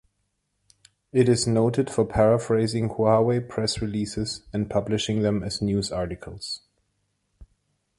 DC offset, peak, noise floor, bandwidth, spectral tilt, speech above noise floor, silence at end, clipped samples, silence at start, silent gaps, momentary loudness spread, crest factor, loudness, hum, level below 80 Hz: under 0.1%; -6 dBFS; -75 dBFS; 11.5 kHz; -6 dB/octave; 52 dB; 0.55 s; under 0.1%; 1.15 s; none; 11 LU; 20 dB; -24 LUFS; 50 Hz at -50 dBFS; -48 dBFS